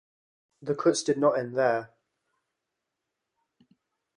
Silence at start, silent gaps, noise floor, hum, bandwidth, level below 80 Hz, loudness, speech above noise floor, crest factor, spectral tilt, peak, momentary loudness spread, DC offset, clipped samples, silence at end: 0.6 s; none; -85 dBFS; none; 11.5 kHz; -76 dBFS; -26 LUFS; 59 dB; 20 dB; -4.5 dB/octave; -10 dBFS; 9 LU; under 0.1%; under 0.1%; 2.3 s